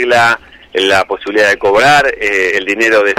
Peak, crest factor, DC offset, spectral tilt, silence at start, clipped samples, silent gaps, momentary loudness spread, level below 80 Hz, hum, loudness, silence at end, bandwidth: -2 dBFS; 8 dB; under 0.1%; -3 dB/octave; 0 s; under 0.1%; none; 7 LU; -44 dBFS; none; -11 LUFS; 0 s; 16 kHz